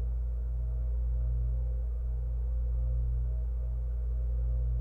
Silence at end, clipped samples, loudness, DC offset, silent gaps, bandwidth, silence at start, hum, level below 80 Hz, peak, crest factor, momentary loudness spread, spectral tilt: 0 s; under 0.1%; -34 LUFS; under 0.1%; none; 1.5 kHz; 0 s; 60 Hz at -45 dBFS; -30 dBFS; -22 dBFS; 8 dB; 3 LU; -11 dB/octave